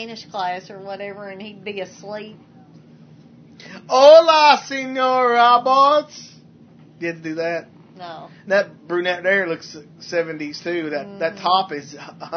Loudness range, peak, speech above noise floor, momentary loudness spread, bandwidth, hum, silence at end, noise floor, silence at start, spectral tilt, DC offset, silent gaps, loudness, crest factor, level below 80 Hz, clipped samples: 16 LU; 0 dBFS; 28 dB; 23 LU; 6.6 kHz; none; 0 s; -47 dBFS; 0 s; -3.5 dB/octave; under 0.1%; none; -17 LUFS; 20 dB; -74 dBFS; under 0.1%